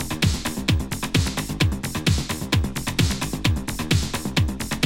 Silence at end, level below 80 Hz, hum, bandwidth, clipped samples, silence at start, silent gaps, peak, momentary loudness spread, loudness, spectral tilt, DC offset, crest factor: 0 s; -32 dBFS; none; 17 kHz; under 0.1%; 0 s; none; -4 dBFS; 2 LU; -23 LUFS; -4.5 dB/octave; under 0.1%; 18 dB